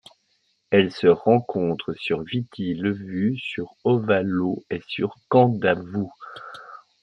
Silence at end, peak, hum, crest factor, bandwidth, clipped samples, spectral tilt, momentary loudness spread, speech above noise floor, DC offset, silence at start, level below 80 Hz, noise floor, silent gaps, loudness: 0.25 s; -4 dBFS; none; 20 dB; 8.4 kHz; under 0.1%; -8.5 dB/octave; 12 LU; 46 dB; under 0.1%; 0.7 s; -64 dBFS; -68 dBFS; none; -23 LUFS